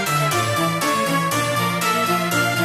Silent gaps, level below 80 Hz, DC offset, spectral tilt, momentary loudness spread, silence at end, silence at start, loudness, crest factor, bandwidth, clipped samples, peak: none; -56 dBFS; under 0.1%; -4 dB/octave; 1 LU; 0 s; 0 s; -19 LUFS; 14 dB; 15.5 kHz; under 0.1%; -6 dBFS